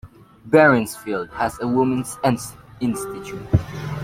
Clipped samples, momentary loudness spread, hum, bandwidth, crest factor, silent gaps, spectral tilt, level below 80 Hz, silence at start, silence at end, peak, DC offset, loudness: under 0.1%; 15 LU; none; 16.5 kHz; 18 dB; none; -6 dB/octave; -44 dBFS; 0.05 s; 0 s; -2 dBFS; under 0.1%; -21 LUFS